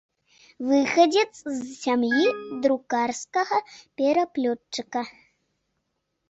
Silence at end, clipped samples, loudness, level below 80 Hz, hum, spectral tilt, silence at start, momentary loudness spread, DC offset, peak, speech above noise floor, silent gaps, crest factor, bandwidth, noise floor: 1.2 s; under 0.1%; -24 LUFS; -70 dBFS; none; -3 dB/octave; 0.6 s; 12 LU; under 0.1%; -6 dBFS; 53 dB; none; 18 dB; 8.2 kHz; -77 dBFS